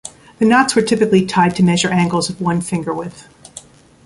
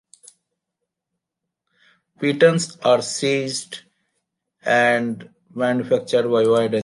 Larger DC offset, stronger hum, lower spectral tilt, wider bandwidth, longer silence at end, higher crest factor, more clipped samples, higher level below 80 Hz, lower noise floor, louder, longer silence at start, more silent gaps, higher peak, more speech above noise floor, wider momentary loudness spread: neither; neither; about the same, -5 dB/octave vs -4.5 dB/octave; about the same, 11.5 kHz vs 11.5 kHz; first, 0.45 s vs 0 s; about the same, 14 dB vs 18 dB; neither; first, -50 dBFS vs -70 dBFS; second, -40 dBFS vs -82 dBFS; first, -15 LUFS vs -19 LUFS; second, 0.05 s vs 2.2 s; neither; about the same, -2 dBFS vs -2 dBFS; second, 26 dB vs 64 dB; first, 21 LU vs 14 LU